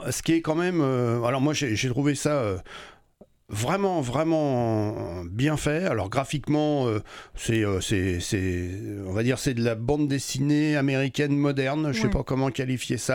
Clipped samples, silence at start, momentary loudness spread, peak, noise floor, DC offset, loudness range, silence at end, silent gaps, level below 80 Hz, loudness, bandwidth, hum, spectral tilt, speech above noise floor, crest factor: under 0.1%; 0 s; 7 LU; -10 dBFS; -57 dBFS; under 0.1%; 2 LU; 0 s; none; -46 dBFS; -25 LUFS; 18 kHz; none; -5.5 dB/octave; 32 dB; 16 dB